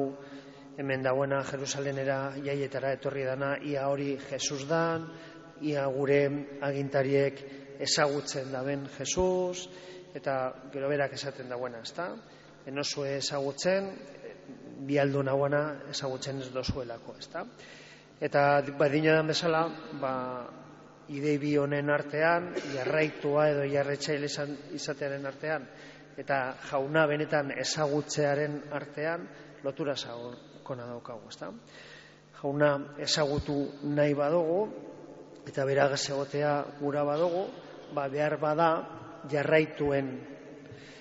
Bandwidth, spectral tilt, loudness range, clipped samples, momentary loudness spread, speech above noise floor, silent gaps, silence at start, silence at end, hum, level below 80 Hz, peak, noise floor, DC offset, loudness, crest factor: 8 kHz; -4 dB/octave; 5 LU; under 0.1%; 18 LU; 22 dB; none; 0 s; 0 s; none; -60 dBFS; -12 dBFS; -52 dBFS; under 0.1%; -30 LUFS; 20 dB